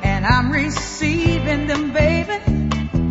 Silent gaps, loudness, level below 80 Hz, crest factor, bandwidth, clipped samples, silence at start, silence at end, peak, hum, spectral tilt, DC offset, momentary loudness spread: none; -19 LUFS; -28 dBFS; 14 dB; 8 kHz; under 0.1%; 0 s; 0 s; -4 dBFS; none; -6 dB/octave; under 0.1%; 4 LU